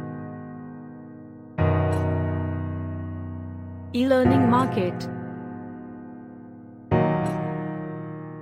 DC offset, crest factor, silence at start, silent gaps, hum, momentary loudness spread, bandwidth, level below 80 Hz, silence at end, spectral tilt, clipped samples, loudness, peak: under 0.1%; 20 dB; 0 s; none; none; 21 LU; 13 kHz; -48 dBFS; 0 s; -8.5 dB/octave; under 0.1%; -25 LUFS; -6 dBFS